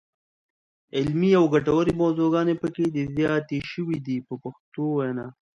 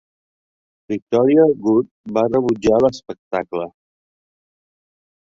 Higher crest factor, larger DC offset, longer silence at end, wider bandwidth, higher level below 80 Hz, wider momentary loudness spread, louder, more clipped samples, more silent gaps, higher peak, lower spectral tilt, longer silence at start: about the same, 16 dB vs 18 dB; neither; second, 0.3 s vs 1.55 s; about the same, 7.8 kHz vs 7.6 kHz; about the same, -56 dBFS vs -54 dBFS; about the same, 12 LU vs 14 LU; second, -24 LUFS vs -18 LUFS; neither; second, 4.60-4.72 s vs 1.02-1.07 s, 1.91-2.04 s, 3.19-3.31 s; second, -8 dBFS vs -2 dBFS; about the same, -8 dB/octave vs -7.5 dB/octave; about the same, 0.95 s vs 0.9 s